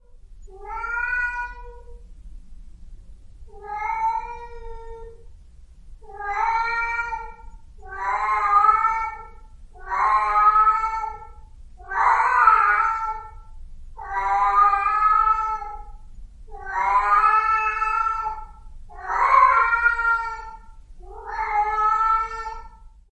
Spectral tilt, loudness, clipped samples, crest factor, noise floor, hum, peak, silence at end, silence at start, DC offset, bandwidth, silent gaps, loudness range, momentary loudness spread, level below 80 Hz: -3 dB/octave; -20 LUFS; under 0.1%; 20 dB; -45 dBFS; none; -4 dBFS; 0.25 s; 0.1 s; under 0.1%; 8.8 kHz; none; 12 LU; 23 LU; -42 dBFS